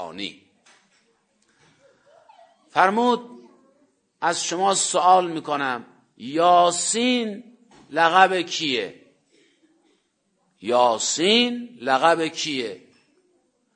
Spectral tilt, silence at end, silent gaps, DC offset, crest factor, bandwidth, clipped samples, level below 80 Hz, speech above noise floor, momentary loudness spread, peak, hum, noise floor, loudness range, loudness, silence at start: -2 dB/octave; 1 s; none; under 0.1%; 24 dB; 9.6 kHz; under 0.1%; -78 dBFS; 49 dB; 15 LU; 0 dBFS; none; -70 dBFS; 6 LU; -20 LUFS; 0 s